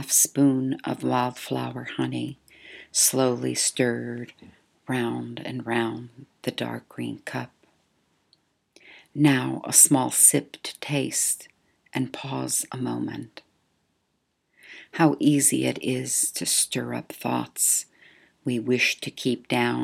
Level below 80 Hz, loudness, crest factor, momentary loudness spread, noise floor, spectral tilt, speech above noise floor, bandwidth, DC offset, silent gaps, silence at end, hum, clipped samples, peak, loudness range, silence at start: -72 dBFS; -23 LUFS; 24 dB; 16 LU; -74 dBFS; -3 dB/octave; 49 dB; 17 kHz; under 0.1%; none; 0 s; none; under 0.1%; -2 dBFS; 11 LU; 0 s